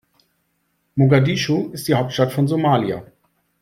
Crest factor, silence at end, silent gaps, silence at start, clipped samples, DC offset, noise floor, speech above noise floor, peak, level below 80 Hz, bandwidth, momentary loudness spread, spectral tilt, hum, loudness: 18 dB; 0.55 s; none; 0.95 s; under 0.1%; under 0.1%; -68 dBFS; 51 dB; -2 dBFS; -56 dBFS; 15.5 kHz; 10 LU; -6.5 dB/octave; none; -19 LUFS